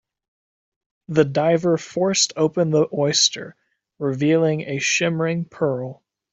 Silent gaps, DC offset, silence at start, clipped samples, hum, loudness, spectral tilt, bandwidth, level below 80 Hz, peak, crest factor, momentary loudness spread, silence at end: none; under 0.1%; 1.1 s; under 0.1%; none; -20 LUFS; -4 dB/octave; 8.2 kHz; -64 dBFS; -4 dBFS; 18 dB; 9 LU; 0.4 s